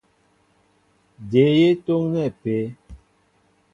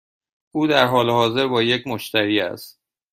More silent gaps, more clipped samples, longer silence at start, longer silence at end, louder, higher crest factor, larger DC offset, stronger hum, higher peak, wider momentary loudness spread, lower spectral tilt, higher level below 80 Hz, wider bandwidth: neither; neither; first, 1.2 s vs 0.55 s; first, 0.75 s vs 0.4 s; about the same, -20 LUFS vs -19 LUFS; about the same, 20 dB vs 20 dB; neither; first, 50 Hz at -55 dBFS vs none; about the same, -4 dBFS vs -2 dBFS; first, 13 LU vs 10 LU; first, -8.5 dB/octave vs -5 dB/octave; first, -54 dBFS vs -60 dBFS; second, 7.2 kHz vs 16 kHz